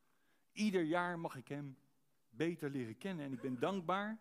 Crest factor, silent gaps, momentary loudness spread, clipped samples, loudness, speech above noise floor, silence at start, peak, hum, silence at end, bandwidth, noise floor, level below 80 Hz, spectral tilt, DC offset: 20 dB; none; 11 LU; under 0.1%; -40 LUFS; 40 dB; 0.55 s; -22 dBFS; none; 0.05 s; 15.5 kHz; -80 dBFS; -88 dBFS; -6 dB/octave; under 0.1%